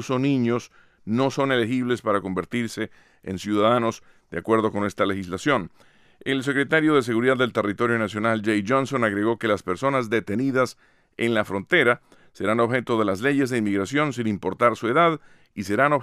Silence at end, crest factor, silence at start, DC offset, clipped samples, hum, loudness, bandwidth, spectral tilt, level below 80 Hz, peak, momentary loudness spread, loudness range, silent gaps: 0 s; 18 dB; 0 s; under 0.1%; under 0.1%; none; -23 LUFS; 14.5 kHz; -6 dB/octave; -62 dBFS; -6 dBFS; 9 LU; 3 LU; none